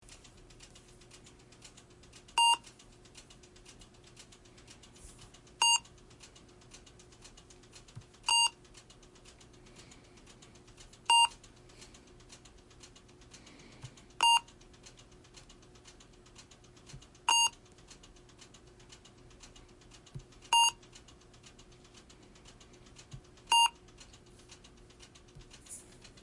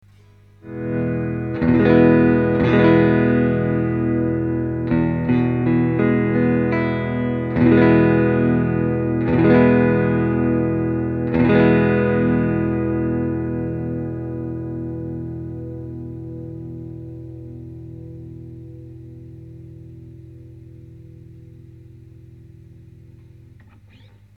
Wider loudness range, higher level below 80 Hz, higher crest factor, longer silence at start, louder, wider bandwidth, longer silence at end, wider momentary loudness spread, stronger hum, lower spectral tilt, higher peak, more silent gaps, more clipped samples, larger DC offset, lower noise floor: second, 2 LU vs 20 LU; second, -64 dBFS vs -40 dBFS; about the same, 22 dB vs 18 dB; first, 2.35 s vs 0.65 s; second, -28 LUFS vs -18 LUFS; first, 11.5 kHz vs 4.9 kHz; second, 0.45 s vs 1.65 s; first, 29 LU vs 22 LU; second, none vs 50 Hz at -50 dBFS; second, 1 dB/octave vs -10.5 dB/octave; second, -14 dBFS vs -2 dBFS; neither; neither; neither; first, -57 dBFS vs -49 dBFS